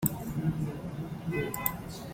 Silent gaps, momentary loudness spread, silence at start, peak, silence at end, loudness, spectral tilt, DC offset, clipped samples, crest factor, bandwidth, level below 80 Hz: none; 7 LU; 0 s; -8 dBFS; 0 s; -34 LUFS; -6 dB/octave; under 0.1%; under 0.1%; 26 dB; 16.5 kHz; -52 dBFS